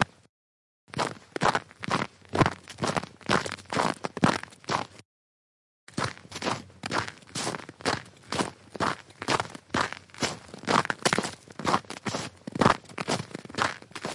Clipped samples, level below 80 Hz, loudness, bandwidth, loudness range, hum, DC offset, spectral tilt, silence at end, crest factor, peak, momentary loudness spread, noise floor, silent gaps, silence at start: under 0.1%; -60 dBFS; -30 LUFS; 11.5 kHz; 5 LU; none; under 0.1%; -4 dB/octave; 0 s; 22 dB; -8 dBFS; 8 LU; under -90 dBFS; 0.29-0.87 s, 5.05-5.87 s; 0 s